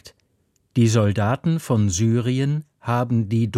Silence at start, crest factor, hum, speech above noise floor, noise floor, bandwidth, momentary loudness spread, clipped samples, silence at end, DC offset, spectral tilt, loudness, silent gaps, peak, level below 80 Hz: 0.05 s; 14 dB; none; 47 dB; -66 dBFS; 13 kHz; 7 LU; under 0.1%; 0 s; under 0.1%; -6.5 dB/octave; -21 LUFS; none; -6 dBFS; -52 dBFS